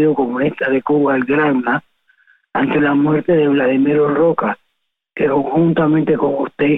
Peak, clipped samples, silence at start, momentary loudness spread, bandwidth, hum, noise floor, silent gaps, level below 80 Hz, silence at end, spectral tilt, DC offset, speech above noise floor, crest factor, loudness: -4 dBFS; under 0.1%; 0 s; 6 LU; 3.9 kHz; none; -72 dBFS; none; -52 dBFS; 0 s; -10 dB/octave; under 0.1%; 57 dB; 12 dB; -15 LUFS